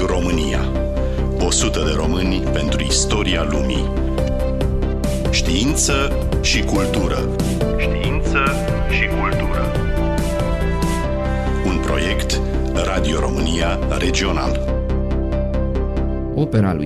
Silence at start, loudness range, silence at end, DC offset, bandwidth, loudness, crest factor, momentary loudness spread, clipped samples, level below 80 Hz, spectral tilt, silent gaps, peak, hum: 0 s; 2 LU; 0 s; under 0.1%; 14 kHz; -19 LUFS; 14 dB; 5 LU; under 0.1%; -22 dBFS; -5 dB/octave; none; -4 dBFS; none